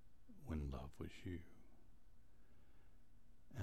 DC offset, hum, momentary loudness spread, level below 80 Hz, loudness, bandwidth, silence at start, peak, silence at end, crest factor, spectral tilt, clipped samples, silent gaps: 0.1%; none; 17 LU; -58 dBFS; -52 LUFS; 15 kHz; 0 s; -34 dBFS; 0 s; 20 dB; -7.5 dB/octave; under 0.1%; none